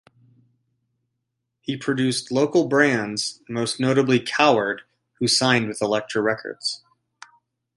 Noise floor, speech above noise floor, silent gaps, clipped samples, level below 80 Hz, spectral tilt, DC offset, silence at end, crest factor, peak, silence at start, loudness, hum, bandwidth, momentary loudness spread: -79 dBFS; 57 dB; none; under 0.1%; -66 dBFS; -4 dB/octave; under 0.1%; 1 s; 22 dB; -2 dBFS; 1.7 s; -21 LUFS; none; 11.5 kHz; 10 LU